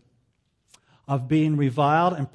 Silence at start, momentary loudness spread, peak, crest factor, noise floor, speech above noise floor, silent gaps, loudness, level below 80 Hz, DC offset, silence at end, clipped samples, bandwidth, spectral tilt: 1.1 s; 8 LU; -8 dBFS; 16 dB; -70 dBFS; 48 dB; none; -22 LUFS; -64 dBFS; under 0.1%; 0.05 s; under 0.1%; 10.5 kHz; -8 dB/octave